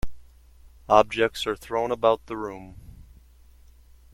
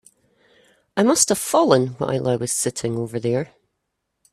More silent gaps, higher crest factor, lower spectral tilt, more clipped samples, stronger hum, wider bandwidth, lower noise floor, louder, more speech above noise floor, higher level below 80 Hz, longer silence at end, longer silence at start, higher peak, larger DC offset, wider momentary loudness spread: neither; first, 26 dB vs 20 dB; about the same, -4.5 dB/octave vs -4 dB/octave; neither; neither; about the same, 16.5 kHz vs 16 kHz; second, -52 dBFS vs -77 dBFS; second, -24 LUFS vs -20 LUFS; second, 29 dB vs 57 dB; first, -46 dBFS vs -60 dBFS; first, 1.1 s vs 0.85 s; second, 0.05 s vs 0.95 s; about the same, -2 dBFS vs -2 dBFS; neither; first, 22 LU vs 9 LU